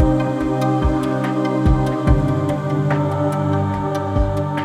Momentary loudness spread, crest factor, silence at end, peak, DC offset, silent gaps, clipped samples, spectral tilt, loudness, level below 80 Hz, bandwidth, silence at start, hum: 3 LU; 16 dB; 0 s; -2 dBFS; under 0.1%; none; under 0.1%; -8.5 dB/octave; -19 LUFS; -26 dBFS; 13 kHz; 0 s; none